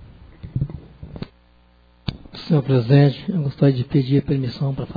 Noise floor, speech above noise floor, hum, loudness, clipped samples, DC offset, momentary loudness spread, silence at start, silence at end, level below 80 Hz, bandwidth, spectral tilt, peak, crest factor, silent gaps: -54 dBFS; 36 dB; 60 Hz at -45 dBFS; -20 LUFS; under 0.1%; under 0.1%; 21 LU; 0 s; 0.05 s; -44 dBFS; 5 kHz; -10 dB/octave; -2 dBFS; 18 dB; none